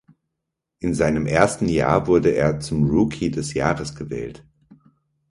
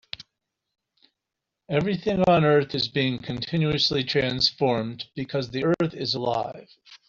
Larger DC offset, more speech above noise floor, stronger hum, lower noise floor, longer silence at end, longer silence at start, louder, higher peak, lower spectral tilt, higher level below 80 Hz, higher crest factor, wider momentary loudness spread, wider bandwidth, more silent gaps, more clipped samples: neither; about the same, 61 dB vs 61 dB; neither; second, -81 dBFS vs -85 dBFS; first, 0.95 s vs 0.1 s; first, 0.8 s vs 0.2 s; first, -21 LUFS vs -24 LUFS; first, 0 dBFS vs -6 dBFS; about the same, -6.5 dB/octave vs -6 dB/octave; first, -42 dBFS vs -56 dBFS; about the same, 22 dB vs 18 dB; about the same, 12 LU vs 12 LU; first, 11.5 kHz vs 7.4 kHz; neither; neither